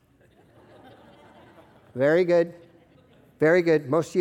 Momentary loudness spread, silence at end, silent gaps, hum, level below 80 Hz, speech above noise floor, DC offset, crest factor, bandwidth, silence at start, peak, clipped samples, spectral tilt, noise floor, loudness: 8 LU; 0 s; none; none; -70 dBFS; 37 dB; under 0.1%; 18 dB; 12 kHz; 1.95 s; -8 dBFS; under 0.1%; -7 dB/octave; -58 dBFS; -22 LUFS